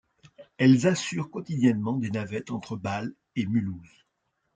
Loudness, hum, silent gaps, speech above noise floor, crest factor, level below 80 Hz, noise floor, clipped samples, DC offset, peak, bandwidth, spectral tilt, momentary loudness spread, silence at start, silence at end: -27 LUFS; none; none; 51 dB; 20 dB; -66 dBFS; -77 dBFS; under 0.1%; under 0.1%; -8 dBFS; 9.2 kHz; -6 dB/octave; 13 LU; 0.4 s; 0.7 s